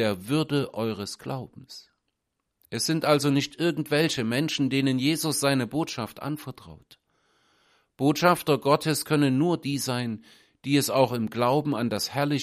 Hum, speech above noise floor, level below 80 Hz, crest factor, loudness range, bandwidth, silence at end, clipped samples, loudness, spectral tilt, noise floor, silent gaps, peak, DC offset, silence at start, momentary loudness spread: none; 55 dB; -64 dBFS; 20 dB; 4 LU; 15.5 kHz; 0 s; under 0.1%; -25 LUFS; -5 dB/octave; -80 dBFS; none; -6 dBFS; under 0.1%; 0 s; 14 LU